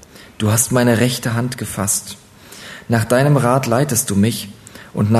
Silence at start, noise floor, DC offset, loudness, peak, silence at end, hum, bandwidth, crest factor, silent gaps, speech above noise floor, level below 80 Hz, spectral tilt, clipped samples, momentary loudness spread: 0.15 s; -37 dBFS; under 0.1%; -17 LUFS; 0 dBFS; 0 s; none; 14 kHz; 18 dB; none; 21 dB; -50 dBFS; -5 dB/octave; under 0.1%; 19 LU